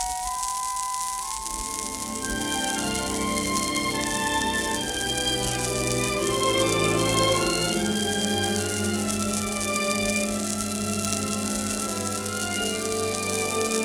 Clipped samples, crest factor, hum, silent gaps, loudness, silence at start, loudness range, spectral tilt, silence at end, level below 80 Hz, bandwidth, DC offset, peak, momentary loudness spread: under 0.1%; 20 dB; none; none; -25 LUFS; 0 s; 3 LU; -3 dB/octave; 0 s; -44 dBFS; 19.5 kHz; under 0.1%; -6 dBFS; 6 LU